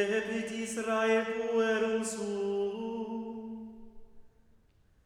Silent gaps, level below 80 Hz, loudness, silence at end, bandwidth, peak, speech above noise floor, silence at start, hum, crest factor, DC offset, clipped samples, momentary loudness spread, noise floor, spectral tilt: none; -66 dBFS; -32 LUFS; 0.75 s; 13 kHz; -16 dBFS; 34 dB; 0 s; none; 16 dB; under 0.1%; under 0.1%; 13 LU; -65 dBFS; -4 dB/octave